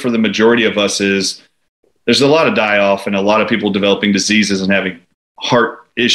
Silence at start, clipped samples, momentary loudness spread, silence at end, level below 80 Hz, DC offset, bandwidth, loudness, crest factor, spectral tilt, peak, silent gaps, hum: 0 s; under 0.1%; 7 LU; 0 s; -56 dBFS; under 0.1%; 12.5 kHz; -13 LUFS; 14 dB; -4 dB/octave; 0 dBFS; 1.69-1.83 s, 5.14-5.35 s; none